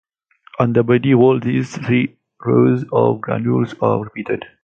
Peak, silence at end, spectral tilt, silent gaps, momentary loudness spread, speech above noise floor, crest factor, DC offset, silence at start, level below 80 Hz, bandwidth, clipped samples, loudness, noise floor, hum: 0 dBFS; 0.2 s; -8.5 dB/octave; none; 11 LU; 33 dB; 16 dB; under 0.1%; 0.6 s; -54 dBFS; 7.6 kHz; under 0.1%; -17 LUFS; -49 dBFS; none